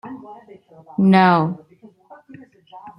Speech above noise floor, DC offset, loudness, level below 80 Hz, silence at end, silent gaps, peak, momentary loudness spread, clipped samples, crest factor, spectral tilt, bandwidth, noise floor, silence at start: 30 dB; under 0.1%; -16 LUFS; -66 dBFS; 0.1 s; none; -2 dBFS; 23 LU; under 0.1%; 18 dB; -8.5 dB/octave; 5.6 kHz; -47 dBFS; 0.05 s